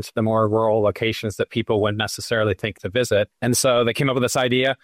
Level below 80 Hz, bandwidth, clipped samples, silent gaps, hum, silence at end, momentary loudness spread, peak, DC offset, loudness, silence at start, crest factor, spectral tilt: -52 dBFS; 16 kHz; under 0.1%; none; none; 0.1 s; 6 LU; -8 dBFS; under 0.1%; -21 LUFS; 0 s; 12 dB; -4.5 dB/octave